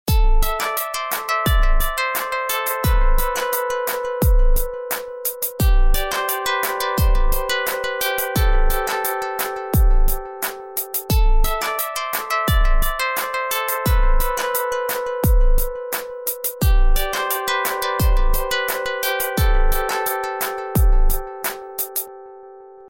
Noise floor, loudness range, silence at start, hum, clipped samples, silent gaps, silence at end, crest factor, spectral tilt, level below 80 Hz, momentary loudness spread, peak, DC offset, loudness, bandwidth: -41 dBFS; 1 LU; 0.05 s; none; under 0.1%; none; 0.05 s; 12 dB; -4 dB/octave; -20 dBFS; 5 LU; -6 dBFS; under 0.1%; -21 LUFS; 17 kHz